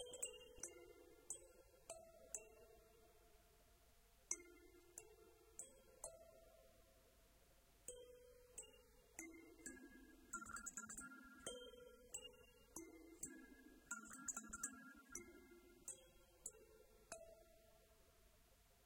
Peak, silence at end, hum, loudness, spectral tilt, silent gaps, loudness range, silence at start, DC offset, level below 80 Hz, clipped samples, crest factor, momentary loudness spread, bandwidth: -28 dBFS; 0 s; none; -56 LUFS; -1.5 dB/octave; none; 8 LU; 0 s; under 0.1%; -76 dBFS; under 0.1%; 32 dB; 17 LU; 16 kHz